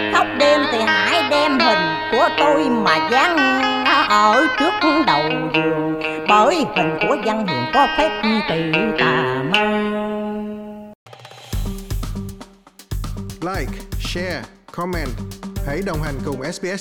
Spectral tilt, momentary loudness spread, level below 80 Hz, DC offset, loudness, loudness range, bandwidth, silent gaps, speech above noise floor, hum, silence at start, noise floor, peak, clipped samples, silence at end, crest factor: -4.5 dB/octave; 14 LU; -36 dBFS; under 0.1%; -17 LUFS; 13 LU; 19 kHz; 10.95-11.06 s; 24 dB; none; 0 s; -43 dBFS; -2 dBFS; under 0.1%; 0 s; 16 dB